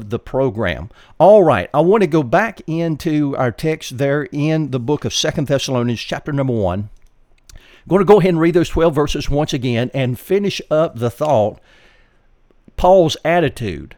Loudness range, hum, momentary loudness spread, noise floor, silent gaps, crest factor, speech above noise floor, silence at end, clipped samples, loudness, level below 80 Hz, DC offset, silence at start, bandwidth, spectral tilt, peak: 5 LU; none; 10 LU; -53 dBFS; none; 16 dB; 37 dB; 0.1 s; under 0.1%; -16 LUFS; -36 dBFS; under 0.1%; 0 s; 18.5 kHz; -6 dB/octave; 0 dBFS